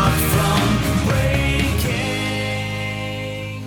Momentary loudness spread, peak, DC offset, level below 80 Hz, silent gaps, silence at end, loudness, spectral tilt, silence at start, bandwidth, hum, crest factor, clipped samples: 9 LU; -4 dBFS; under 0.1%; -28 dBFS; none; 0 s; -20 LUFS; -5 dB/octave; 0 s; 19 kHz; none; 14 dB; under 0.1%